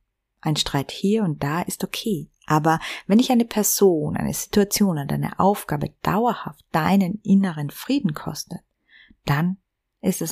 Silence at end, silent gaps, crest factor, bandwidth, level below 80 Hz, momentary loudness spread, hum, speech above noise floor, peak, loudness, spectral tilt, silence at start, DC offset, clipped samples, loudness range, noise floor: 0 s; none; 18 dB; 15.5 kHz; -50 dBFS; 12 LU; none; 32 dB; -4 dBFS; -22 LUFS; -5 dB/octave; 0.45 s; under 0.1%; under 0.1%; 3 LU; -54 dBFS